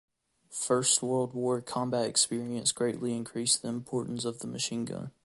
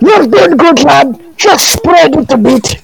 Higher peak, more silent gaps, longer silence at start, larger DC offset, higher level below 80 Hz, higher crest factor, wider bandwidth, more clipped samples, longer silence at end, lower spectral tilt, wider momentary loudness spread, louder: second, -12 dBFS vs 0 dBFS; neither; first, 0.5 s vs 0 s; second, under 0.1% vs 0.8%; second, -70 dBFS vs -34 dBFS; first, 20 dB vs 6 dB; second, 12 kHz vs 19 kHz; second, under 0.1% vs 4%; about the same, 0.15 s vs 0.05 s; about the same, -3 dB/octave vs -3.5 dB/octave; first, 10 LU vs 4 LU; second, -30 LUFS vs -6 LUFS